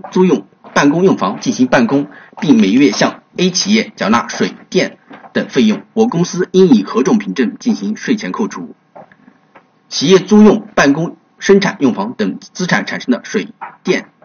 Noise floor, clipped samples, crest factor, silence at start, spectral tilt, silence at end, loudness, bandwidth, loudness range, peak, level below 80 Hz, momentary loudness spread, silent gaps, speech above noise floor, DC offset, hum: -48 dBFS; under 0.1%; 14 dB; 0.05 s; -5 dB/octave; 0.2 s; -13 LUFS; 7 kHz; 3 LU; 0 dBFS; -52 dBFS; 11 LU; none; 35 dB; under 0.1%; none